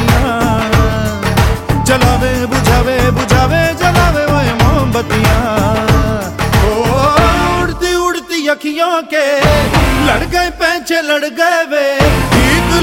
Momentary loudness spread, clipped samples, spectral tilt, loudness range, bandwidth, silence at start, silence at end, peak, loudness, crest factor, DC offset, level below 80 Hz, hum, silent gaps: 4 LU; under 0.1%; -5 dB/octave; 1 LU; 17 kHz; 0 s; 0 s; 0 dBFS; -12 LUFS; 12 dB; under 0.1%; -20 dBFS; none; none